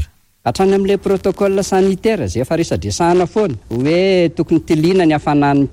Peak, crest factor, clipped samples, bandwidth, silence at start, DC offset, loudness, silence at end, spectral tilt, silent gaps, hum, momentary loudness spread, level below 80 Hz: -4 dBFS; 10 dB; under 0.1%; 15.5 kHz; 0 s; under 0.1%; -15 LUFS; 0 s; -6 dB/octave; none; none; 6 LU; -38 dBFS